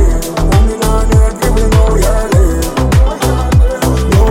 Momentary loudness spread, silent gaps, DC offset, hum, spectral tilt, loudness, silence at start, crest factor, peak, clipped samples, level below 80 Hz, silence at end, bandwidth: 3 LU; none; under 0.1%; none; -6 dB/octave; -12 LUFS; 0 s; 8 dB; 0 dBFS; under 0.1%; -12 dBFS; 0 s; 16.5 kHz